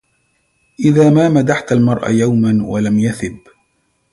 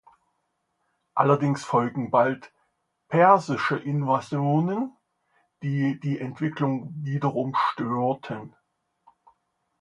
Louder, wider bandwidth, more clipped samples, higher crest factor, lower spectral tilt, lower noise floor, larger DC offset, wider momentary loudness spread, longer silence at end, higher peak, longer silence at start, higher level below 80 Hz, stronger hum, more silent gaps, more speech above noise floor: first, -13 LUFS vs -25 LUFS; about the same, 11.5 kHz vs 11 kHz; neither; second, 14 dB vs 22 dB; about the same, -7.5 dB/octave vs -7.5 dB/octave; second, -63 dBFS vs -76 dBFS; neither; second, 8 LU vs 11 LU; second, 0.75 s vs 1.35 s; first, 0 dBFS vs -4 dBFS; second, 0.8 s vs 1.15 s; first, -48 dBFS vs -70 dBFS; neither; neither; about the same, 50 dB vs 52 dB